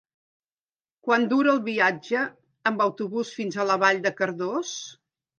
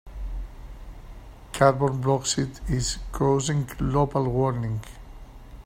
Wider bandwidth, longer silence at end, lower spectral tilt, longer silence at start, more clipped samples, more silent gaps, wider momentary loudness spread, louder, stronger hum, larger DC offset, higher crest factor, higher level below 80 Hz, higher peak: second, 9.4 kHz vs 16 kHz; first, 0.45 s vs 0.05 s; second, -4 dB/octave vs -5.5 dB/octave; first, 1.05 s vs 0.05 s; neither; neither; second, 11 LU vs 23 LU; about the same, -24 LUFS vs -25 LUFS; neither; neither; about the same, 20 dB vs 22 dB; second, -80 dBFS vs -38 dBFS; about the same, -4 dBFS vs -4 dBFS